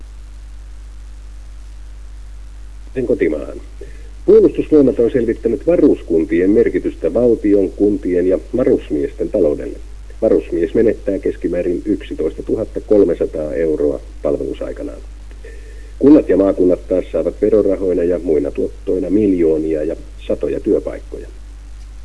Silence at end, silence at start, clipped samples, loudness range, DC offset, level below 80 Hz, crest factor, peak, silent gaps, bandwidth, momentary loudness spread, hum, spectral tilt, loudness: 0 s; 0 s; under 0.1%; 5 LU; 0.9%; -32 dBFS; 16 dB; 0 dBFS; none; 11 kHz; 24 LU; none; -8.5 dB/octave; -16 LUFS